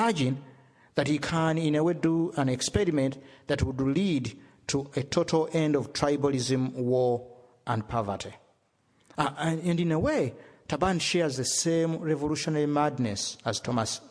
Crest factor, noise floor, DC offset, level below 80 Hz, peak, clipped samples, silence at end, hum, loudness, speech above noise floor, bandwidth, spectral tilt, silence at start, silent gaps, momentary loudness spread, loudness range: 20 dB; -68 dBFS; under 0.1%; -52 dBFS; -8 dBFS; under 0.1%; 0 s; none; -28 LUFS; 41 dB; 11 kHz; -5 dB/octave; 0 s; none; 8 LU; 3 LU